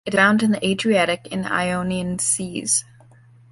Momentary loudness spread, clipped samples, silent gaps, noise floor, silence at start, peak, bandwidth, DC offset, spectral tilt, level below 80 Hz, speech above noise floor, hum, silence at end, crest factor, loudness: 8 LU; under 0.1%; none; -49 dBFS; 0.05 s; -2 dBFS; 11.5 kHz; under 0.1%; -3.5 dB/octave; -54 dBFS; 29 dB; none; 0.7 s; 18 dB; -20 LUFS